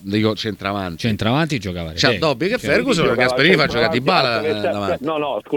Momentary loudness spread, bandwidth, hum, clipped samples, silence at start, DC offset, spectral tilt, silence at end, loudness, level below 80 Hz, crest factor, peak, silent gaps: 9 LU; 19 kHz; none; under 0.1%; 0 s; under 0.1%; -5 dB/octave; 0 s; -18 LUFS; -46 dBFS; 18 dB; 0 dBFS; none